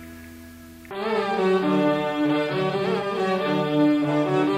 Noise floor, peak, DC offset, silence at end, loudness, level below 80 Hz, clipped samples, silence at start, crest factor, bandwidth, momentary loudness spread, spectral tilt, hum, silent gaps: -43 dBFS; -10 dBFS; under 0.1%; 0 s; -23 LUFS; -58 dBFS; under 0.1%; 0 s; 12 dB; 15 kHz; 21 LU; -7 dB/octave; none; none